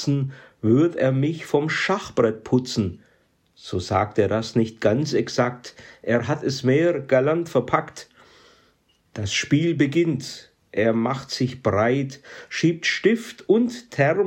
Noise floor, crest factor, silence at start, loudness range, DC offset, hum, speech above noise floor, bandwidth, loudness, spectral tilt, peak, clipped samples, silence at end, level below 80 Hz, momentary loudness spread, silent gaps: -63 dBFS; 16 dB; 0 s; 2 LU; under 0.1%; none; 41 dB; 16 kHz; -22 LUFS; -6 dB/octave; -6 dBFS; under 0.1%; 0 s; -62 dBFS; 12 LU; none